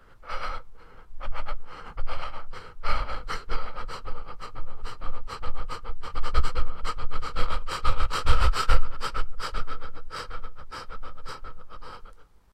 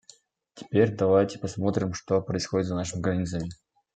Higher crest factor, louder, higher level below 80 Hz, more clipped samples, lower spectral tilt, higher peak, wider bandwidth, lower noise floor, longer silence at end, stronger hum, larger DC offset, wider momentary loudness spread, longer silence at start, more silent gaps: about the same, 18 dB vs 20 dB; second, -34 LUFS vs -27 LUFS; first, -30 dBFS vs -56 dBFS; neither; second, -4 dB/octave vs -6 dB/octave; first, -4 dBFS vs -8 dBFS; about the same, 8.8 kHz vs 9.2 kHz; second, -45 dBFS vs -57 dBFS; about the same, 0.3 s vs 0.4 s; neither; neither; first, 15 LU vs 7 LU; second, 0.2 s vs 0.55 s; neither